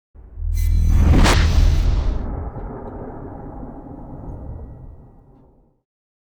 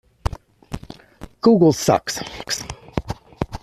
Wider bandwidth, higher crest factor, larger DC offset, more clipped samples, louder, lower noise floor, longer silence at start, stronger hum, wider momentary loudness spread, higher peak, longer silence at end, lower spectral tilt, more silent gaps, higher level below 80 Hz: first, 17 kHz vs 14.5 kHz; about the same, 14 dB vs 18 dB; neither; neither; about the same, -19 LUFS vs -20 LUFS; first, -52 dBFS vs -42 dBFS; about the same, 0.25 s vs 0.3 s; neither; about the same, 21 LU vs 21 LU; second, -6 dBFS vs -2 dBFS; first, 1.4 s vs 0.05 s; about the same, -5.5 dB/octave vs -5 dB/octave; neither; first, -22 dBFS vs -38 dBFS